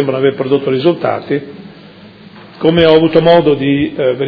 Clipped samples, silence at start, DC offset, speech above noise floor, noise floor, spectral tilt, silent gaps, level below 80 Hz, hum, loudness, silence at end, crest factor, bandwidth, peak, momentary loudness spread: 0.4%; 0 s; under 0.1%; 26 dB; -37 dBFS; -9 dB/octave; none; -44 dBFS; none; -12 LUFS; 0 s; 12 dB; 5.4 kHz; 0 dBFS; 10 LU